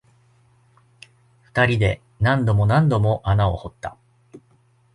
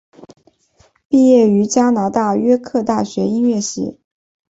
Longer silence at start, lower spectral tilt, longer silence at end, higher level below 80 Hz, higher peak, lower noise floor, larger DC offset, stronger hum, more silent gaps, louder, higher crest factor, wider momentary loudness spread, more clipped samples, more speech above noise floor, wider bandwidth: first, 1.55 s vs 0.2 s; first, -7.5 dB/octave vs -6 dB/octave; about the same, 0.55 s vs 0.55 s; first, -40 dBFS vs -58 dBFS; about the same, -4 dBFS vs -2 dBFS; first, -59 dBFS vs -55 dBFS; neither; neither; second, none vs 1.05-1.10 s; second, -20 LUFS vs -15 LUFS; about the same, 18 dB vs 14 dB; first, 14 LU vs 9 LU; neither; about the same, 40 dB vs 41 dB; first, 10.5 kHz vs 8 kHz